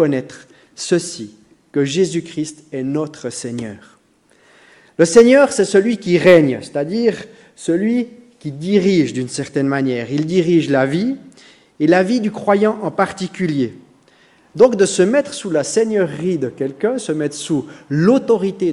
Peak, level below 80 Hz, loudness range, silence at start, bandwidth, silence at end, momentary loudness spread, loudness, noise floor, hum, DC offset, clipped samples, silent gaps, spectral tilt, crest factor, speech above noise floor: 0 dBFS; -60 dBFS; 8 LU; 0 s; 11.5 kHz; 0 s; 14 LU; -16 LUFS; -55 dBFS; none; under 0.1%; 0.1%; none; -5.5 dB/octave; 16 dB; 39 dB